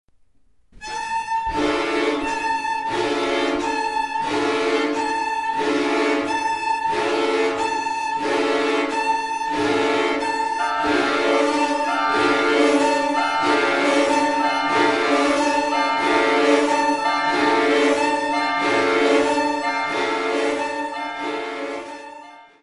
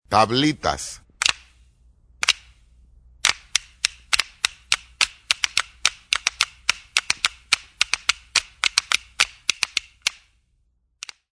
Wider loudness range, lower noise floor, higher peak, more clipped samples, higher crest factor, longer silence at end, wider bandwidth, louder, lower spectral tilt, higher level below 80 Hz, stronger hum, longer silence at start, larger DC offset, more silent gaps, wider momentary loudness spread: about the same, 4 LU vs 3 LU; second, -62 dBFS vs -66 dBFS; second, -4 dBFS vs 0 dBFS; neither; second, 16 dB vs 26 dB; second, 0.2 s vs 1.25 s; about the same, 11.5 kHz vs 11 kHz; about the same, -20 LUFS vs -22 LUFS; first, -3 dB/octave vs -1 dB/octave; about the same, -54 dBFS vs -52 dBFS; neither; first, 0.75 s vs 0.1 s; first, 0.1% vs under 0.1%; neither; about the same, 6 LU vs 6 LU